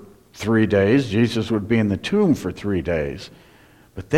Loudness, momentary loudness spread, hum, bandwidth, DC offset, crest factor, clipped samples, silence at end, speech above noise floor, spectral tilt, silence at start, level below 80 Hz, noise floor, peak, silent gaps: -20 LUFS; 17 LU; none; 14 kHz; under 0.1%; 16 dB; under 0.1%; 0 s; 31 dB; -7 dB/octave; 0 s; -46 dBFS; -51 dBFS; -4 dBFS; none